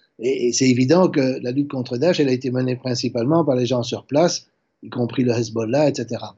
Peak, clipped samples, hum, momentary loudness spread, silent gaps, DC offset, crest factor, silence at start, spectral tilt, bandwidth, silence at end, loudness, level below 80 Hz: -4 dBFS; under 0.1%; none; 8 LU; none; under 0.1%; 16 dB; 0.2 s; -5.5 dB/octave; 8 kHz; 0.05 s; -20 LUFS; -70 dBFS